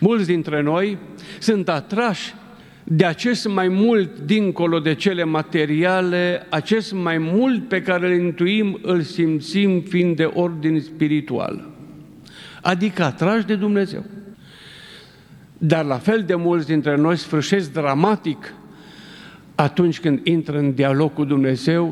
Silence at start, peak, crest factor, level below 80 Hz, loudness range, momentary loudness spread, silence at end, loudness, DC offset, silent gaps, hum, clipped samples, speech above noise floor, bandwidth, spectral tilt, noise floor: 0 s; 0 dBFS; 20 dB; -62 dBFS; 4 LU; 10 LU; 0 s; -20 LUFS; under 0.1%; none; none; under 0.1%; 27 dB; 12 kHz; -6.5 dB/octave; -46 dBFS